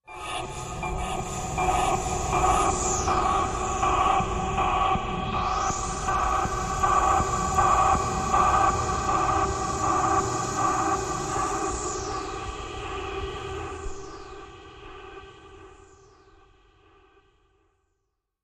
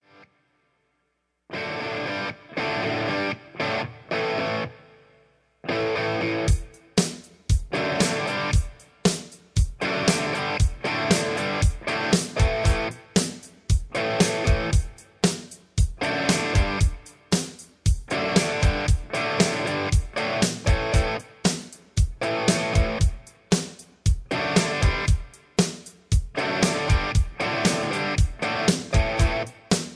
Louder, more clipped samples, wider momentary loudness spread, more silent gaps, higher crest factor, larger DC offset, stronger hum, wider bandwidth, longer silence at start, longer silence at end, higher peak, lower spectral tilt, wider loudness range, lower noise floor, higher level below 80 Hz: about the same, -25 LUFS vs -25 LUFS; neither; first, 14 LU vs 7 LU; neither; about the same, 18 dB vs 20 dB; neither; neither; first, 13.5 kHz vs 11 kHz; second, 0.1 s vs 1.5 s; first, 2.65 s vs 0 s; second, -10 dBFS vs -4 dBFS; about the same, -4 dB/octave vs -4.5 dB/octave; first, 14 LU vs 4 LU; first, -79 dBFS vs -74 dBFS; second, -38 dBFS vs -30 dBFS